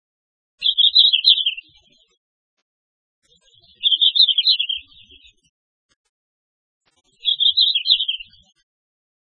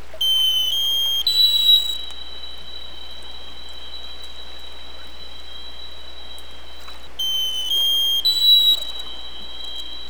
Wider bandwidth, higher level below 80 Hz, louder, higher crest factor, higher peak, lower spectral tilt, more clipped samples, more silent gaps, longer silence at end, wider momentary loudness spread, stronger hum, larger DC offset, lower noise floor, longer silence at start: second, 11 kHz vs over 20 kHz; second, -68 dBFS vs -48 dBFS; about the same, -14 LUFS vs -16 LUFS; about the same, 22 dB vs 18 dB; first, 0 dBFS vs -4 dBFS; second, 2.5 dB/octave vs 0.5 dB/octave; neither; first, 2.17-3.22 s, 5.49-5.89 s, 5.96-6.81 s vs none; first, 1.15 s vs 0 s; second, 12 LU vs 24 LU; second, none vs 60 Hz at -45 dBFS; second, under 0.1% vs 4%; first, -56 dBFS vs -40 dBFS; first, 0.6 s vs 0 s